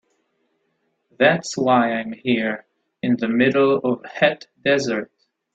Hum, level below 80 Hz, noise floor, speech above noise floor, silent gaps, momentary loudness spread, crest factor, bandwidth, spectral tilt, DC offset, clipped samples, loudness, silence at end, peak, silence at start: none; -62 dBFS; -70 dBFS; 51 dB; none; 9 LU; 18 dB; 8.4 kHz; -5 dB/octave; under 0.1%; under 0.1%; -20 LUFS; 0.5 s; -2 dBFS; 1.2 s